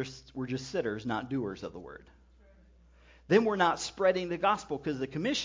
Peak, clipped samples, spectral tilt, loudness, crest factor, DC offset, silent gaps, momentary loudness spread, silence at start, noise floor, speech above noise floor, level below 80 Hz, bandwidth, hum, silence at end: -10 dBFS; under 0.1%; -5 dB/octave; -31 LUFS; 22 dB; under 0.1%; none; 15 LU; 0 s; -59 dBFS; 28 dB; -60 dBFS; 7.6 kHz; none; 0 s